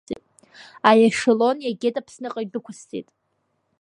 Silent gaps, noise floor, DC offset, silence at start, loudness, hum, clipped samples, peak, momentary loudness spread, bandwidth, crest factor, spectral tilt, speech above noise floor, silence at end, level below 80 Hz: none; -72 dBFS; under 0.1%; 0.1 s; -20 LUFS; none; under 0.1%; 0 dBFS; 20 LU; 11 kHz; 22 dB; -4.5 dB/octave; 51 dB; 0.8 s; -66 dBFS